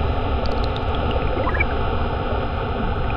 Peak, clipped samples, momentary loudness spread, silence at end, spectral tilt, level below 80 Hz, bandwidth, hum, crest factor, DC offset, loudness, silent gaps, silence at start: -8 dBFS; under 0.1%; 3 LU; 0 s; -8.5 dB/octave; -26 dBFS; 6 kHz; none; 14 dB; under 0.1%; -23 LUFS; none; 0 s